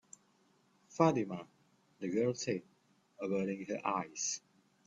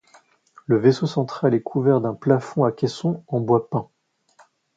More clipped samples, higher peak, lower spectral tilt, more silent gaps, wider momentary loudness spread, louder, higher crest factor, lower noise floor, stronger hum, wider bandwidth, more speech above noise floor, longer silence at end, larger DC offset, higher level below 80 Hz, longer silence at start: neither; second, -14 dBFS vs -2 dBFS; second, -5 dB/octave vs -8 dB/octave; neither; first, 13 LU vs 8 LU; second, -36 LUFS vs -21 LUFS; about the same, 24 dB vs 20 dB; first, -71 dBFS vs -57 dBFS; neither; about the same, 8 kHz vs 7.8 kHz; about the same, 36 dB vs 37 dB; second, 0.5 s vs 0.95 s; neither; second, -78 dBFS vs -64 dBFS; first, 0.9 s vs 0.7 s